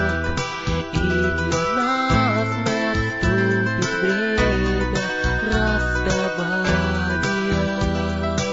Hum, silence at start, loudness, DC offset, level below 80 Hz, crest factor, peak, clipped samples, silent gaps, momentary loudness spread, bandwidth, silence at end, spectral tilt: none; 0 s; -21 LUFS; 0.3%; -30 dBFS; 14 dB; -6 dBFS; under 0.1%; none; 4 LU; 8 kHz; 0 s; -5.5 dB/octave